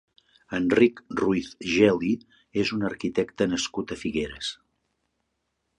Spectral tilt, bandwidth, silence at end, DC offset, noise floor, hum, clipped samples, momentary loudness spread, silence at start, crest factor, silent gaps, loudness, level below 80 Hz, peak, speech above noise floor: -5 dB/octave; 10.5 kHz; 1.25 s; under 0.1%; -78 dBFS; none; under 0.1%; 12 LU; 0.5 s; 22 dB; none; -26 LUFS; -56 dBFS; -6 dBFS; 53 dB